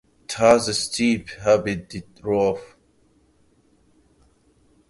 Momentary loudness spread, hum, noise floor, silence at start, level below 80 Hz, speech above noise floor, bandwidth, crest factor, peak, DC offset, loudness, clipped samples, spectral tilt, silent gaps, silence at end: 16 LU; none; -60 dBFS; 0.3 s; -52 dBFS; 39 dB; 11.5 kHz; 22 dB; -2 dBFS; under 0.1%; -21 LUFS; under 0.1%; -4 dB/octave; none; 2.25 s